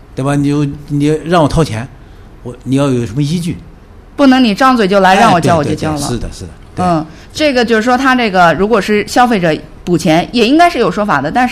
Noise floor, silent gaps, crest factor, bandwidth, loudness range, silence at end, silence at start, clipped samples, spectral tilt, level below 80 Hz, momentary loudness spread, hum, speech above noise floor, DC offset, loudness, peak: -35 dBFS; none; 12 dB; 15 kHz; 4 LU; 0 s; 0.1 s; 0.4%; -5.5 dB/octave; -34 dBFS; 14 LU; none; 25 dB; under 0.1%; -11 LUFS; 0 dBFS